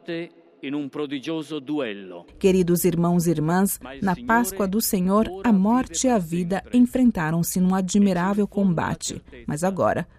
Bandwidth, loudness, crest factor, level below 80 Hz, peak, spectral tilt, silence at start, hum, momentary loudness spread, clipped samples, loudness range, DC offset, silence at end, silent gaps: 15.5 kHz; -22 LUFS; 16 dB; -48 dBFS; -6 dBFS; -5.5 dB/octave; 0.1 s; none; 12 LU; under 0.1%; 2 LU; under 0.1%; 0.15 s; none